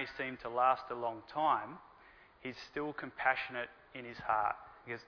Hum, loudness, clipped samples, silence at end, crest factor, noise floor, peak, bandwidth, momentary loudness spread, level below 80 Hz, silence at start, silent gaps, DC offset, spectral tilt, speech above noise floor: none; -36 LUFS; under 0.1%; 0.05 s; 22 dB; -61 dBFS; -14 dBFS; 5.4 kHz; 15 LU; -70 dBFS; 0 s; none; under 0.1%; -5.5 dB/octave; 25 dB